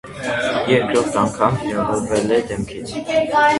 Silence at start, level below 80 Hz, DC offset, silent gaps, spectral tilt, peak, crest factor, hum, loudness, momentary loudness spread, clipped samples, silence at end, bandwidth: 0.05 s; -46 dBFS; under 0.1%; none; -5 dB/octave; 0 dBFS; 18 dB; none; -19 LUFS; 10 LU; under 0.1%; 0 s; 11.5 kHz